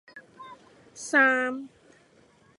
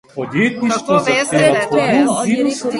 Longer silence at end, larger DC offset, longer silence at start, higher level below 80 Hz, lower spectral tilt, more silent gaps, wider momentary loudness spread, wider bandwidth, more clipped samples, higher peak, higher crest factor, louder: first, 0.9 s vs 0 s; neither; about the same, 0.15 s vs 0.15 s; second, -78 dBFS vs -56 dBFS; second, -2.5 dB/octave vs -4.5 dB/octave; neither; first, 27 LU vs 4 LU; about the same, 11.5 kHz vs 11.5 kHz; neither; second, -8 dBFS vs 0 dBFS; first, 20 dB vs 14 dB; second, -23 LUFS vs -15 LUFS